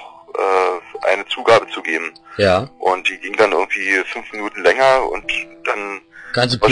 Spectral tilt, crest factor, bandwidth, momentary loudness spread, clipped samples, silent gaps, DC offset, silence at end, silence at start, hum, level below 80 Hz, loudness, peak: -4.5 dB/octave; 14 dB; 10.5 kHz; 11 LU; under 0.1%; none; under 0.1%; 0 s; 0 s; none; -48 dBFS; -17 LUFS; -2 dBFS